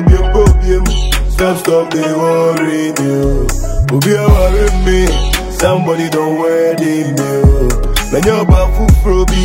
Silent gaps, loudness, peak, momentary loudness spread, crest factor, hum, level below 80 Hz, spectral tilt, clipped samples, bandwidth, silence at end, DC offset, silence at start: none; -12 LUFS; 0 dBFS; 5 LU; 10 dB; none; -14 dBFS; -6 dB/octave; 0.1%; 16.5 kHz; 0 s; under 0.1%; 0 s